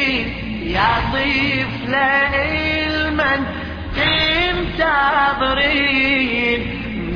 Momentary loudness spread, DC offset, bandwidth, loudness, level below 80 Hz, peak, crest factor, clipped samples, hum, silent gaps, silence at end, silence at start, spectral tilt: 8 LU; under 0.1%; 5.4 kHz; -17 LUFS; -32 dBFS; -4 dBFS; 14 dB; under 0.1%; none; none; 0 s; 0 s; -6 dB/octave